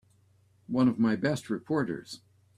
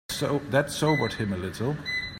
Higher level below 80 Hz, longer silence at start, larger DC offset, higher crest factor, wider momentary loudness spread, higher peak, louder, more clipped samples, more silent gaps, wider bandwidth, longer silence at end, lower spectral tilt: second, -66 dBFS vs -52 dBFS; first, 0.7 s vs 0.1 s; neither; about the same, 18 dB vs 18 dB; first, 16 LU vs 6 LU; second, -14 dBFS vs -10 dBFS; about the same, -29 LUFS vs -27 LUFS; neither; neither; second, 13 kHz vs 16.5 kHz; first, 0.4 s vs 0 s; first, -6.5 dB/octave vs -5 dB/octave